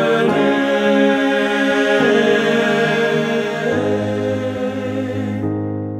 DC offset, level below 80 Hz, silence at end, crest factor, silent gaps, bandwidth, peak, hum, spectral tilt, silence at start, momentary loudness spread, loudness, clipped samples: under 0.1%; -56 dBFS; 0 s; 14 dB; none; 14 kHz; -2 dBFS; none; -5.5 dB/octave; 0 s; 8 LU; -17 LUFS; under 0.1%